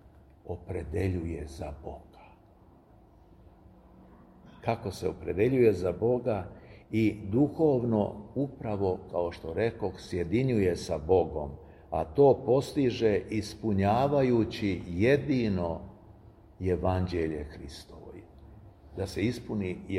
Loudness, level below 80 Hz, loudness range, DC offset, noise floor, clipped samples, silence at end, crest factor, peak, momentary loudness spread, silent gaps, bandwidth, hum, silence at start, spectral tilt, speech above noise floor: -29 LUFS; -50 dBFS; 11 LU; under 0.1%; -57 dBFS; under 0.1%; 0 s; 20 dB; -10 dBFS; 17 LU; none; 13 kHz; none; 0.05 s; -7.5 dB/octave; 29 dB